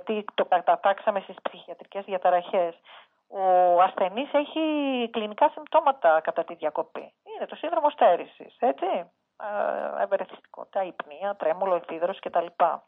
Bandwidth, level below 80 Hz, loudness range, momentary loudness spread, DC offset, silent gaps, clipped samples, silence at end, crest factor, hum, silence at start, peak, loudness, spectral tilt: 4 kHz; -88 dBFS; 5 LU; 15 LU; under 0.1%; none; under 0.1%; 0.1 s; 18 dB; none; 0.05 s; -8 dBFS; -25 LUFS; -8 dB/octave